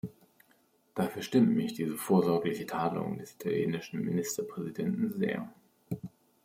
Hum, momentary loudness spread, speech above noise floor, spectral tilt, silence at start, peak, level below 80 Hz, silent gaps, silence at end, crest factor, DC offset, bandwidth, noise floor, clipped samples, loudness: none; 15 LU; 37 dB; -6 dB/octave; 0.05 s; -14 dBFS; -72 dBFS; none; 0.35 s; 18 dB; under 0.1%; 16.5 kHz; -68 dBFS; under 0.1%; -32 LUFS